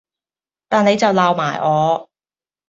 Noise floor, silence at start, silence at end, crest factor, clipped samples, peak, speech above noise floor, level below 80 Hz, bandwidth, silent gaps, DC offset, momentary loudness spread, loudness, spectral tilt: under -90 dBFS; 0.7 s; 0.65 s; 16 dB; under 0.1%; -2 dBFS; over 75 dB; -62 dBFS; 7.8 kHz; none; under 0.1%; 5 LU; -16 LUFS; -5.5 dB/octave